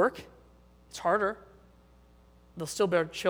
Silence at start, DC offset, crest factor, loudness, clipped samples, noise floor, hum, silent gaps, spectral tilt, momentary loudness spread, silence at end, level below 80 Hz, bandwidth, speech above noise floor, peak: 0 s; under 0.1%; 20 dB; -30 LUFS; under 0.1%; -59 dBFS; none; none; -4.5 dB/octave; 19 LU; 0 s; -60 dBFS; over 20 kHz; 30 dB; -12 dBFS